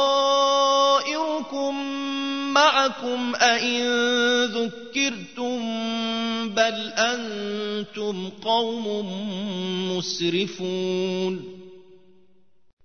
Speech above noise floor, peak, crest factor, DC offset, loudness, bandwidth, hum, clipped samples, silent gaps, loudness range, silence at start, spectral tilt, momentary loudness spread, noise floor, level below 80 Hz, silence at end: 40 dB; -4 dBFS; 20 dB; 0.3%; -23 LUFS; 6.6 kHz; none; under 0.1%; none; 6 LU; 0 s; -3 dB/octave; 11 LU; -64 dBFS; -70 dBFS; 1.05 s